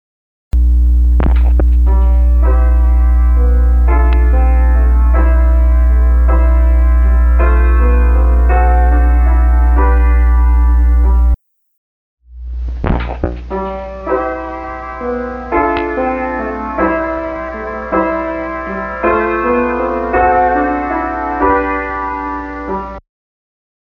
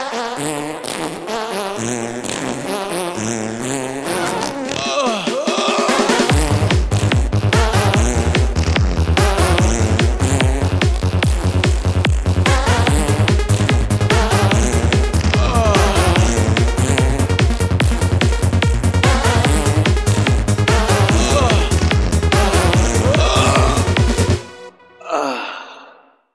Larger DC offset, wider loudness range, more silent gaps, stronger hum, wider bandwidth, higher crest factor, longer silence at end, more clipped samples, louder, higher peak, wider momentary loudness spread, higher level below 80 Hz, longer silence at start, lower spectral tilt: neither; about the same, 7 LU vs 6 LU; first, 11.78-12.17 s vs none; neither; second, 3.3 kHz vs 13 kHz; about the same, 10 dB vs 14 dB; first, 0.95 s vs 0.5 s; neither; about the same, -14 LUFS vs -16 LUFS; about the same, 0 dBFS vs 0 dBFS; about the same, 10 LU vs 8 LU; first, -12 dBFS vs -22 dBFS; first, 0.55 s vs 0 s; first, -10 dB/octave vs -5 dB/octave